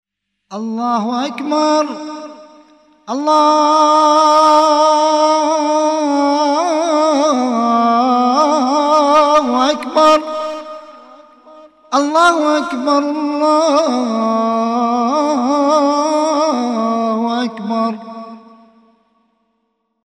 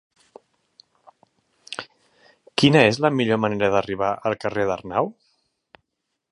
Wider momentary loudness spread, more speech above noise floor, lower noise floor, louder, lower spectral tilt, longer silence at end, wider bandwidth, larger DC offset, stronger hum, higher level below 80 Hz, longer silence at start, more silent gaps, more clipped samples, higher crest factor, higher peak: second, 12 LU vs 18 LU; second, 54 dB vs 59 dB; second, -67 dBFS vs -79 dBFS; first, -14 LUFS vs -21 LUFS; second, -3.5 dB/octave vs -5.5 dB/octave; first, 1.65 s vs 1.2 s; about the same, 11 kHz vs 11 kHz; neither; neither; about the same, -62 dBFS vs -58 dBFS; second, 0.5 s vs 1.7 s; neither; neither; second, 14 dB vs 24 dB; about the same, 0 dBFS vs 0 dBFS